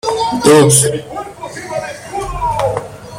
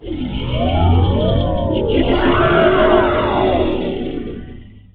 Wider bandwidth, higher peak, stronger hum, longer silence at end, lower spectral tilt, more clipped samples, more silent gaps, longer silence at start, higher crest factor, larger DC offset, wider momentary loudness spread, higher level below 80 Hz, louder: first, 17 kHz vs 4.6 kHz; about the same, 0 dBFS vs 0 dBFS; neither; second, 0 s vs 0.15 s; second, -4 dB/octave vs -10.5 dB/octave; neither; neither; about the same, 0.05 s vs 0 s; about the same, 14 dB vs 16 dB; neither; first, 19 LU vs 12 LU; second, -36 dBFS vs -26 dBFS; first, -13 LUFS vs -16 LUFS